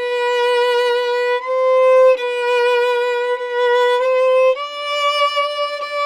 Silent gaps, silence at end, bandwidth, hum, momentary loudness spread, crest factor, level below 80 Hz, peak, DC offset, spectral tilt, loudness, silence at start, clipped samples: none; 0 s; 12 kHz; none; 7 LU; 12 dB; -64 dBFS; -4 dBFS; under 0.1%; 2 dB/octave; -16 LUFS; 0 s; under 0.1%